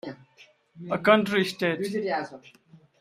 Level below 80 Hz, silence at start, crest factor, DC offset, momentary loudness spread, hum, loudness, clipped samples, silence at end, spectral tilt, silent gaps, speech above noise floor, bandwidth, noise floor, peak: -70 dBFS; 0.05 s; 22 dB; under 0.1%; 20 LU; none; -25 LUFS; under 0.1%; 0.25 s; -5.5 dB/octave; none; 32 dB; 15 kHz; -58 dBFS; -4 dBFS